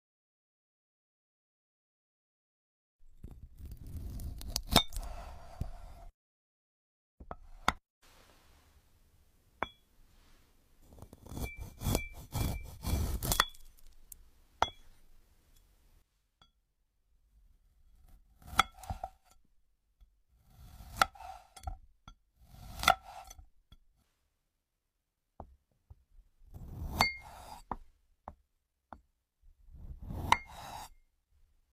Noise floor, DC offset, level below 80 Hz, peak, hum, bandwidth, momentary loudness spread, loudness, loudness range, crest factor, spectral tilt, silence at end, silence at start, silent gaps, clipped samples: -84 dBFS; under 0.1%; -48 dBFS; -8 dBFS; none; 15.5 kHz; 25 LU; -35 LUFS; 12 LU; 32 dB; -3 dB/octave; 0.8 s; 3 s; 6.14-7.18 s, 7.90-8.01 s; under 0.1%